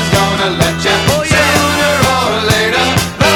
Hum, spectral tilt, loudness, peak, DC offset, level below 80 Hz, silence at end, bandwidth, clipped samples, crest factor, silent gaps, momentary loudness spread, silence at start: none; -3.5 dB/octave; -11 LUFS; 0 dBFS; under 0.1%; -30 dBFS; 0 s; 19.5 kHz; under 0.1%; 12 dB; none; 3 LU; 0 s